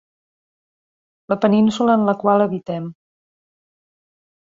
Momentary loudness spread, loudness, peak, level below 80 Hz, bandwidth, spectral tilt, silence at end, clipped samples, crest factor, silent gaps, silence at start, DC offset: 12 LU; -18 LUFS; -2 dBFS; -64 dBFS; 7.6 kHz; -7.5 dB/octave; 1.5 s; under 0.1%; 18 dB; none; 1.3 s; under 0.1%